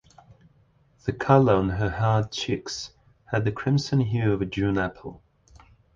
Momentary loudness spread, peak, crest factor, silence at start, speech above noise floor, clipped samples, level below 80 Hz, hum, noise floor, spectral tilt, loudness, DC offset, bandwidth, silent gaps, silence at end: 14 LU; -4 dBFS; 22 dB; 1.05 s; 38 dB; under 0.1%; -46 dBFS; none; -61 dBFS; -6.5 dB/octave; -25 LUFS; under 0.1%; 7.6 kHz; none; 0.8 s